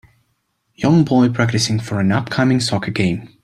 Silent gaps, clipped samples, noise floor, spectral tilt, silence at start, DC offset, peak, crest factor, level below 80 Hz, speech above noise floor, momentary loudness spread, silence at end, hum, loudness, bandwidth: none; under 0.1%; -68 dBFS; -5.5 dB/octave; 0.8 s; under 0.1%; -2 dBFS; 16 dB; -50 dBFS; 51 dB; 6 LU; 0.15 s; none; -17 LUFS; 13 kHz